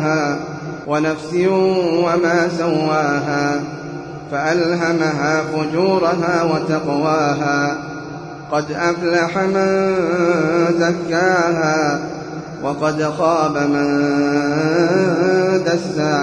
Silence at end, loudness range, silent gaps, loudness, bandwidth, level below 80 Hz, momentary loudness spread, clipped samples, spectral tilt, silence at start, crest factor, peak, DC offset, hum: 0 s; 2 LU; none; -17 LUFS; 10.5 kHz; -54 dBFS; 10 LU; under 0.1%; -6 dB/octave; 0 s; 14 dB; -4 dBFS; under 0.1%; none